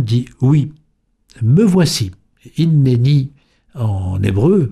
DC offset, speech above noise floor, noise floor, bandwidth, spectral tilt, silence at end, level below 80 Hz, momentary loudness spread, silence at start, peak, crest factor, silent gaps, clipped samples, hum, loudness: under 0.1%; 46 dB; -60 dBFS; 13.5 kHz; -7 dB/octave; 0 s; -44 dBFS; 12 LU; 0 s; -2 dBFS; 12 dB; none; under 0.1%; none; -15 LUFS